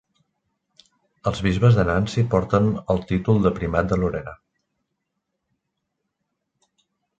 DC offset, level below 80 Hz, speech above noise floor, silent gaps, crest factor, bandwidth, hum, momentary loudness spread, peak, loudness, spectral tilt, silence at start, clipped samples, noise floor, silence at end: under 0.1%; -40 dBFS; 58 dB; none; 20 dB; 8.2 kHz; none; 10 LU; -4 dBFS; -21 LUFS; -8 dB/octave; 1.25 s; under 0.1%; -78 dBFS; 2.85 s